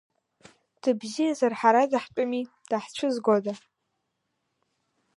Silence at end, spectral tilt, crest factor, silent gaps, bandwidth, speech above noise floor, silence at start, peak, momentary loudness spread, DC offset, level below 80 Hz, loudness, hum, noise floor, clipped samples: 1.6 s; -5 dB/octave; 22 dB; none; 11.5 kHz; 54 dB; 0.85 s; -6 dBFS; 10 LU; under 0.1%; -78 dBFS; -26 LUFS; none; -79 dBFS; under 0.1%